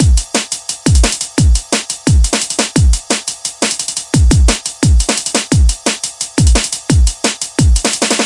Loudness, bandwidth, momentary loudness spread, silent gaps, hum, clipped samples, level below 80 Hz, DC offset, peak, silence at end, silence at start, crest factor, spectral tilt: -13 LUFS; 11.5 kHz; 5 LU; none; none; under 0.1%; -16 dBFS; under 0.1%; 0 dBFS; 0 s; 0 s; 12 dB; -4 dB/octave